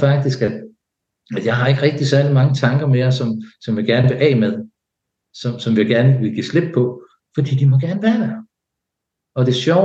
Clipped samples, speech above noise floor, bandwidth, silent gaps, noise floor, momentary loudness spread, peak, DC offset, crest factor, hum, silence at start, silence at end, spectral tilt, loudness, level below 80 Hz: under 0.1%; 65 dB; 7.6 kHz; none; -80 dBFS; 12 LU; -2 dBFS; under 0.1%; 14 dB; none; 0 s; 0 s; -7.5 dB/octave; -17 LUFS; -60 dBFS